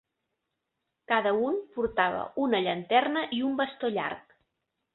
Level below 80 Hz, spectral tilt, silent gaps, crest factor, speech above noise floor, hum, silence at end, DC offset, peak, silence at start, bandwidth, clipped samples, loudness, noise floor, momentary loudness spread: -64 dBFS; -8.5 dB/octave; none; 22 dB; 55 dB; none; 0.75 s; under 0.1%; -8 dBFS; 1.1 s; 4.3 kHz; under 0.1%; -28 LUFS; -83 dBFS; 6 LU